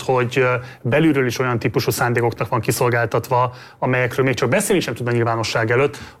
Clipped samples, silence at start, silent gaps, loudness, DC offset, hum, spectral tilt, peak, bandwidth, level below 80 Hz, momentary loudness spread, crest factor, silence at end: under 0.1%; 0 s; none; -19 LUFS; under 0.1%; none; -5.5 dB/octave; -6 dBFS; 16.5 kHz; -52 dBFS; 4 LU; 14 dB; 0.1 s